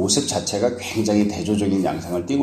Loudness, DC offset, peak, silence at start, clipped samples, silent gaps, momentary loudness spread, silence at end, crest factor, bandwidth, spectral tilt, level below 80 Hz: -21 LUFS; under 0.1%; -6 dBFS; 0 s; under 0.1%; none; 4 LU; 0 s; 16 dB; 15 kHz; -4.5 dB/octave; -50 dBFS